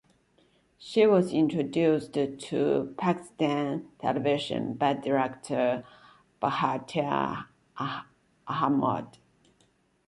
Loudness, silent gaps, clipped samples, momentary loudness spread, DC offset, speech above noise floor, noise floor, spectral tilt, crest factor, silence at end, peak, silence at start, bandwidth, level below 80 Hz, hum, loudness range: -28 LUFS; none; under 0.1%; 11 LU; under 0.1%; 40 dB; -67 dBFS; -6.5 dB/octave; 18 dB; 1 s; -10 dBFS; 0.8 s; 11.5 kHz; -66 dBFS; none; 5 LU